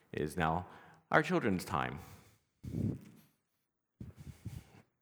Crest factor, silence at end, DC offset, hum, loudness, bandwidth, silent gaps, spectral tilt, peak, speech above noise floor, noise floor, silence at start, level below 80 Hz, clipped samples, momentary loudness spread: 28 dB; 0.4 s; under 0.1%; none; -35 LUFS; over 20 kHz; none; -6 dB/octave; -10 dBFS; 50 dB; -85 dBFS; 0.15 s; -58 dBFS; under 0.1%; 21 LU